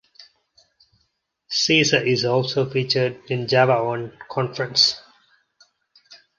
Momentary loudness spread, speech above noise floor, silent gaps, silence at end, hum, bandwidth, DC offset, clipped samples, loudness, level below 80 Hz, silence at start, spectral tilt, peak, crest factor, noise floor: 11 LU; 51 dB; none; 0.25 s; none; 9.6 kHz; under 0.1%; under 0.1%; -20 LUFS; -64 dBFS; 0.2 s; -4 dB/octave; -2 dBFS; 20 dB; -71 dBFS